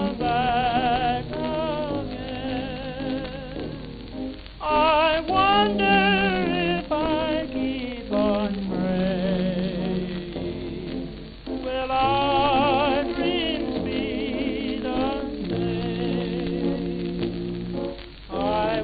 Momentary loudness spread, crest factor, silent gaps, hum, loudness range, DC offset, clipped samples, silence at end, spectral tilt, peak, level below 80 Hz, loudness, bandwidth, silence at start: 13 LU; 18 dB; none; none; 7 LU; under 0.1%; under 0.1%; 0 s; -9.5 dB/octave; -8 dBFS; -42 dBFS; -24 LUFS; 5 kHz; 0 s